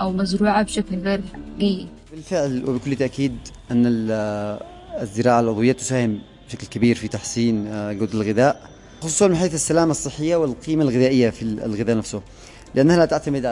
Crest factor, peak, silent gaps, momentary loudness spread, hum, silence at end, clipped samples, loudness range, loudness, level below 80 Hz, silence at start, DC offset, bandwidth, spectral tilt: 16 dB; -4 dBFS; none; 14 LU; none; 0 s; under 0.1%; 4 LU; -21 LUFS; -46 dBFS; 0 s; under 0.1%; 11.5 kHz; -5.5 dB/octave